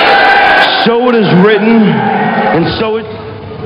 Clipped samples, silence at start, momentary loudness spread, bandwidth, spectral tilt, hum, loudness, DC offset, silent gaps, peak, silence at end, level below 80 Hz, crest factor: 0.5%; 0 s; 12 LU; 8.2 kHz; -7 dB/octave; none; -8 LUFS; under 0.1%; none; 0 dBFS; 0 s; -40 dBFS; 8 dB